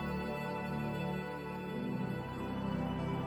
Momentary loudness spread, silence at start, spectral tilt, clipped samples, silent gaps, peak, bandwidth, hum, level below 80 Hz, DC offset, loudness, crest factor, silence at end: 3 LU; 0 s; -7.5 dB/octave; under 0.1%; none; -24 dBFS; 19.5 kHz; none; -54 dBFS; under 0.1%; -39 LUFS; 14 dB; 0 s